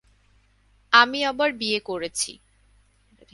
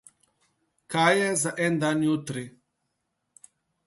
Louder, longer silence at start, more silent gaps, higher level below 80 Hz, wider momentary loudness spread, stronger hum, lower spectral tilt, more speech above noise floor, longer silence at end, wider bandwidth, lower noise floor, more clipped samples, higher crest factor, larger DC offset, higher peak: first, -22 LUFS vs -25 LUFS; about the same, 0.9 s vs 0.9 s; neither; first, -60 dBFS vs -70 dBFS; second, 12 LU vs 15 LU; neither; second, -1 dB/octave vs -4 dB/octave; second, 37 dB vs 54 dB; second, 1 s vs 1.35 s; about the same, 12 kHz vs 12 kHz; second, -61 dBFS vs -79 dBFS; neither; about the same, 24 dB vs 20 dB; neither; first, 0 dBFS vs -8 dBFS